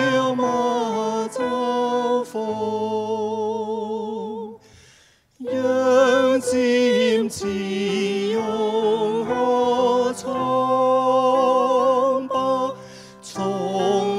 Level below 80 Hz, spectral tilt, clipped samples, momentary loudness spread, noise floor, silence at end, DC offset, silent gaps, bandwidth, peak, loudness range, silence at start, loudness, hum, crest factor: -64 dBFS; -4.5 dB/octave; under 0.1%; 10 LU; -55 dBFS; 0 s; under 0.1%; none; 13 kHz; -4 dBFS; 6 LU; 0 s; -21 LUFS; none; 16 dB